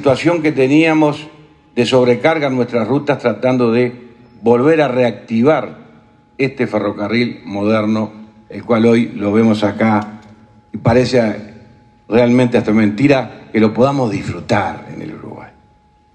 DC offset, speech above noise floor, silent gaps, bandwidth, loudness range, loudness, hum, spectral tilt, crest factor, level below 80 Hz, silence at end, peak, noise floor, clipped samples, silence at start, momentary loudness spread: under 0.1%; 37 dB; none; 9.2 kHz; 3 LU; -14 LUFS; none; -7 dB/octave; 14 dB; -50 dBFS; 0.65 s; 0 dBFS; -51 dBFS; under 0.1%; 0 s; 15 LU